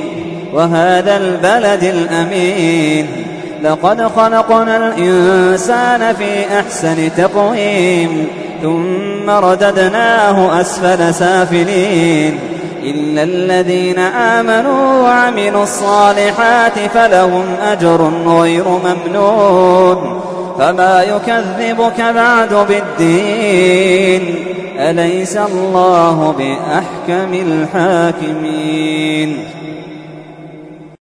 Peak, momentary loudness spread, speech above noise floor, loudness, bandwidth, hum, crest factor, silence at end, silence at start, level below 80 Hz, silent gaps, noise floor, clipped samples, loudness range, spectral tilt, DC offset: 0 dBFS; 9 LU; 22 dB; -11 LUFS; 11 kHz; none; 12 dB; 0.15 s; 0 s; -50 dBFS; none; -32 dBFS; under 0.1%; 3 LU; -5 dB/octave; under 0.1%